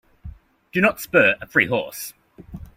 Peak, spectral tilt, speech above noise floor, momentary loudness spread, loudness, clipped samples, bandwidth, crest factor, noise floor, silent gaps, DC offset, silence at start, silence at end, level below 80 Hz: -4 dBFS; -4.5 dB/octave; 21 dB; 17 LU; -19 LUFS; under 0.1%; 16.5 kHz; 20 dB; -41 dBFS; none; under 0.1%; 0.25 s; 0.1 s; -48 dBFS